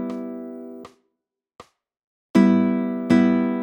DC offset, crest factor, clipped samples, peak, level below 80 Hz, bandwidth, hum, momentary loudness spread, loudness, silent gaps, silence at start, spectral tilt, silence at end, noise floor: under 0.1%; 18 dB; under 0.1%; -4 dBFS; -66 dBFS; 8.4 kHz; none; 19 LU; -19 LUFS; 2.04-2.34 s; 0 s; -8 dB/octave; 0 s; -80 dBFS